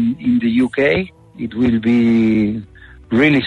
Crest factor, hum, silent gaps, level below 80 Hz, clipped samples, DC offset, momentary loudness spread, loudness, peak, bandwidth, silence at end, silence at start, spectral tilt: 14 dB; none; none; -44 dBFS; under 0.1%; under 0.1%; 13 LU; -16 LUFS; -2 dBFS; 5.6 kHz; 0 s; 0 s; -7.5 dB/octave